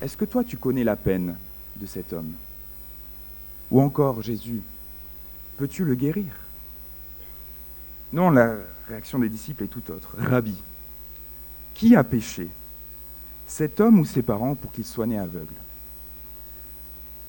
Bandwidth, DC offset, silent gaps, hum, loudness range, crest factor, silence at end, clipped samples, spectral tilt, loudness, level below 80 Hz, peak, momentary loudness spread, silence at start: 17 kHz; under 0.1%; none; 60 Hz at -45 dBFS; 7 LU; 22 dB; 0 s; under 0.1%; -7.5 dB/octave; -24 LUFS; -46 dBFS; -4 dBFS; 19 LU; 0 s